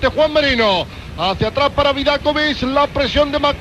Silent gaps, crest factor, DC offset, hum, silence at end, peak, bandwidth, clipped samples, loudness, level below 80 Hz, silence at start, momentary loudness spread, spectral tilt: none; 14 dB; under 0.1%; none; 0 s; -2 dBFS; 12.5 kHz; under 0.1%; -16 LUFS; -32 dBFS; 0 s; 6 LU; -5 dB/octave